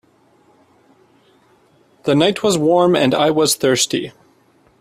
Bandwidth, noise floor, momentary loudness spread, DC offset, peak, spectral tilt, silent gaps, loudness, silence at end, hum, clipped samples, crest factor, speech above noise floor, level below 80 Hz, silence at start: 15.5 kHz; -55 dBFS; 9 LU; under 0.1%; 0 dBFS; -4 dB/octave; none; -15 LUFS; 0.7 s; none; under 0.1%; 18 dB; 40 dB; -60 dBFS; 2.05 s